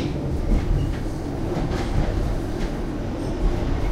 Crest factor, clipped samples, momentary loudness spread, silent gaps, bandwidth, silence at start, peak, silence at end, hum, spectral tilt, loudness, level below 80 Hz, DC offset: 14 dB; under 0.1%; 4 LU; none; 12 kHz; 0 s; -8 dBFS; 0 s; none; -7.5 dB/octave; -26 LUFS; -26 dBFS; under 0.1%